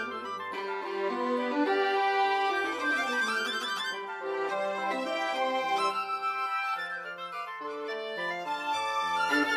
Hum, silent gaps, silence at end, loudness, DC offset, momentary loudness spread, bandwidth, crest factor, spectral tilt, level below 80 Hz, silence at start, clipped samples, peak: none; none; 0 s; -30 LUFS; under 0.1%; 9 LU; 15 kHz; 16 dB; -2.5 dB/octave; -88 dBFS; 0 s; under 0.1%; -16 dBFS